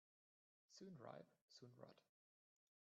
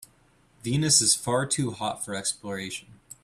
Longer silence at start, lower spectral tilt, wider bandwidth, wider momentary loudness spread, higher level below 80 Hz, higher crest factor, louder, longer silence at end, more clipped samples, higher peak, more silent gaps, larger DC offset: about the same, 0.7 s vs 0.65 s; first, -5 dB/octave vs -3 dB/octave; second, 7.4 kHz vs 15 kHz; second, 8 LU vs 16 LU; second, under -90 dBFS vs -60 dBFS; about the same, 24 dB vs 22 dB; second, -63 LUFS vs -24 LUFS; first, 0.9 s vs 0.3 s; neither; second, -42 dBFS vs -6 dBFS; first, 1.41-1.48 s vs none; neither